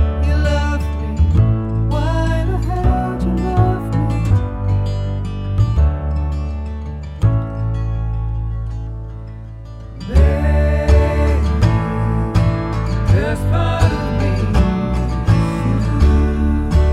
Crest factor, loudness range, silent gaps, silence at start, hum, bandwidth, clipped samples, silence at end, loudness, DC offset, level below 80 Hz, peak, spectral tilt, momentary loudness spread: 14 dB; 5 LU; none; 0 s; none; 10.5 kHz; under 0.1%; 0 s; -17 LUFS; under 0.1%; -20 dBFS; -2 dBFS; -8 dB/octave; 10 LU